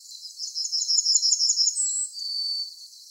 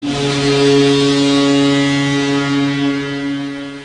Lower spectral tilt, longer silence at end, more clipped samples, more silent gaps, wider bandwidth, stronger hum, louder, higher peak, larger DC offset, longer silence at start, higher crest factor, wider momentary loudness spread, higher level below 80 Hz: second, 11 dB/octave vs -5 dB/octave; about the same, 0 s vs 0 s; neither; neither; first, 18 kHz vs 10.5 kHz; neither; second, -22 LUFS vs -14 LUFS; second, -8 dBFS vs -2 dBFS; neither; about the same, 0 s vs 0 s; first, 18 dB vs 12 dB; first, 16 LU vs 9 LU; second, under -90 dBFS vs -46 dBFS